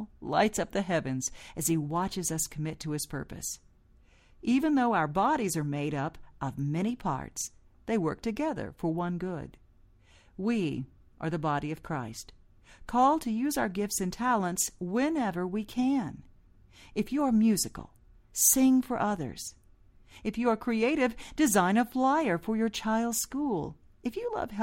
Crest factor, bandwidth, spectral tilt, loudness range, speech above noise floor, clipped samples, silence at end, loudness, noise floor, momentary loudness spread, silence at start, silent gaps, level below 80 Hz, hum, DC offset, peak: 20 dB; 16 kHz; -4.5 dB/octave; 7 LU; 31 dB; under 0.1%; 0 s; -30 LUFS; -60 dBFS; 13 LU; 0 s; none; -54 dBFS; none; under 0.1%; -10 dBFS